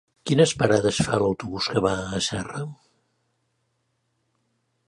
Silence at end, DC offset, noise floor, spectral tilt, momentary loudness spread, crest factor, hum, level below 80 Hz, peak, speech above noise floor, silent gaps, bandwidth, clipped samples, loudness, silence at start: 2.15 s; under 0.1%; -73 dBFS; -4.5 dB/octave; 12 LU; 22 dB; none; -52 dBFS; -4 dBFS; 50 dB; none; 11.5 kHz; under 0.1%; -23 LUFS; 0.25 s